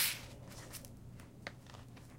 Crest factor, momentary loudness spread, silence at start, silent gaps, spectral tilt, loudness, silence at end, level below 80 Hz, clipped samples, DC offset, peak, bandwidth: 24 dB; 10 LU; 0 s; none; -1.5 dB/octave; -46 LUFS; 0 s; -62 dBFS; under 0.1%; under 0.1%; -20 dBFS; 16.5 kHz